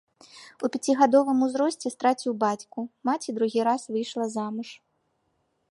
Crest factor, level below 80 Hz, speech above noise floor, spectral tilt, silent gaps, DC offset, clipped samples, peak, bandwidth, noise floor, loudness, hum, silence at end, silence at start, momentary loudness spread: 20 dB; -80 dBFS; 48 dB; -4.5 dB/octave; none; under 0.1%; under 0.1%; -6 dBFS; 11.5 kHz; -73 dBFS; -26 LUFS; none; 0.95 s; 0.35 s; 13 LU